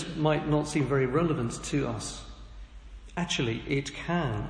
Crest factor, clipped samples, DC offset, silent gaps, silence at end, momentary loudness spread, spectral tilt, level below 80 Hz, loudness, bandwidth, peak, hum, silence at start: 18 dB; under 0.1%; under 0.1%; none; 0 s; 22 LU; -5.5 dB/octave; -46 dBFS; -29 LUFS; 10.5 kHz; -12 dBFS; none; 0 s